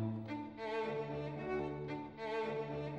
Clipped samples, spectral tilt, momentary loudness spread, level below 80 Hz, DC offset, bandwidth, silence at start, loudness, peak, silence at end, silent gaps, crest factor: under 0.1%; -8 dB/octave; 4 LU; -66 dBFS; under 0.1%; 8.4 kHz; 0 s; -41 LUFS; -30 dBFS; 0 s; none; 12 dB